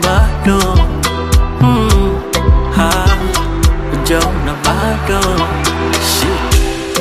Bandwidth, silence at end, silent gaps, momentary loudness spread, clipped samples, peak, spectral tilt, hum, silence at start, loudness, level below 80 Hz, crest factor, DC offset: 15.5 kHz; 0 s; none; 4 LU; under 0.1%; 0 dBFS; -4.5 dB/octave; none; 0 s; -13 LUFS; -16 dBFS; 12 dB; under 0.1%